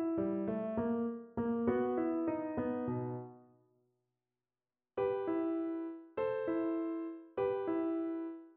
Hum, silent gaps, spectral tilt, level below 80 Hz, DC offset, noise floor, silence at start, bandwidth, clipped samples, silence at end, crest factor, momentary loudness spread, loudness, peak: none; none; -8 dB/octave; -70 dBFS; under 0.1%; under -90 dBFS; 0 s; 3.9 kHz; under 0.1%; 0.05 s; 16 dB; 8 LU; -37 LUFS; -20 dBFS